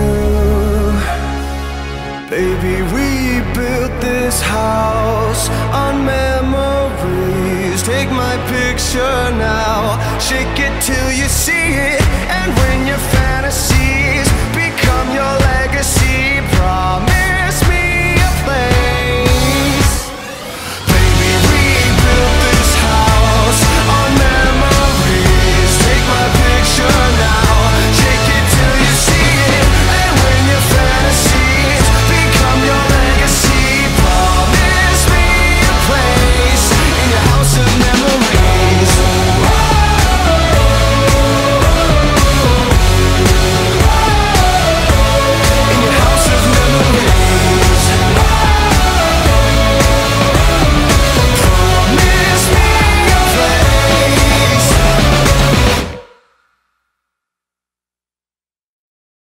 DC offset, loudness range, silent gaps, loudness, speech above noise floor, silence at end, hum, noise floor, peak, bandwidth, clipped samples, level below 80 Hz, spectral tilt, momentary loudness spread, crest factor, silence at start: under 0.1%; 5 LU; none; -11 LUFS; over 76 dB; 3.25 s; none; under -90 dBFS; 0 dBFS; 16.5 kHz; under 0.1%; -16 dBFS; -4 dB/octave; 6 LU; 10 dB; 0 s